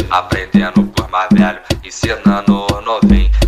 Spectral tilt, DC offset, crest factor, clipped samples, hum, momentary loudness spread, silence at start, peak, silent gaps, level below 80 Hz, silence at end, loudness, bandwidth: -6 dB/octave; 0.3%; 12 dB; under 0.1%; none; 7 LU; 0 s; 0 dBFS; none; -20 dBFS; 0 s; -14 LUFS; 14 kHz